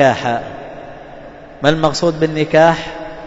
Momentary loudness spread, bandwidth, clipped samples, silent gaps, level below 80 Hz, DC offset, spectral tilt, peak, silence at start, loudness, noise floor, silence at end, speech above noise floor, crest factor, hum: 23 LU; 8 kHz; under 0.1%; none; -42 dBFS; under 0.1%; -5.5 dB/octave; 0 dBFS; 0 s; -15 LUFS; -35 dBFS; 0 s; 21 dB; 16 dB; none